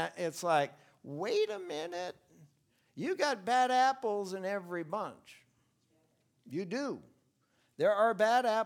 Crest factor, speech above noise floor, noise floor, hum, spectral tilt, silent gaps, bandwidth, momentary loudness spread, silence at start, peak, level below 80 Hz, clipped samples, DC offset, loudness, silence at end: 18 dB; 42 dB; -74 dBFS; none; -4 dB/octave; none; 16.5 kHz; 13 LU; 0 s; -16 dBFS; -86 dBFS; under 0.1%; under 0.1%; -33 LUFS; 0 s